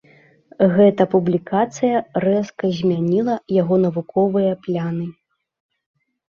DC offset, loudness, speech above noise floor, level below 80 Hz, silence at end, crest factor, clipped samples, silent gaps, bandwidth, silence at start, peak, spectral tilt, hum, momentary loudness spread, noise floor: under 0.1%; -19 LUFS; 34 dB; -60 dBFS; 1.2 s; 16 dB; under 0.1%; none; 7.2 kHz; 0.6 s; -2 dBFS; -8 dB/octave; none; 9 LU; -51 dBFS